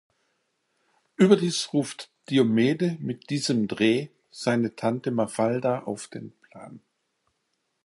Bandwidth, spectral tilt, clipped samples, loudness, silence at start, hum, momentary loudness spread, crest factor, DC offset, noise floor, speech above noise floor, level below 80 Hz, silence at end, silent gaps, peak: 11.5 kHz; -5.5 dB/octave; under 0.1%; -25 LUFS; 1.2 s; none; 20 LU; 22 dB; under 0.1%; -76 dBFS; 52 dB; -70 dBFS; 1.05 s; none; -4 dBFS